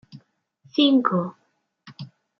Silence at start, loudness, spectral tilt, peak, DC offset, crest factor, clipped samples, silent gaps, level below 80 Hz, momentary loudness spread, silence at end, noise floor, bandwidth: 0.15 s; -21 LUFS; -7.5 dB/octave; -4 dBFS; under 0.1%; 20 dB; under 0.1%; none; -78 dBFS; 23 LU; 0.35 s; -59 dBFS; 6 kHz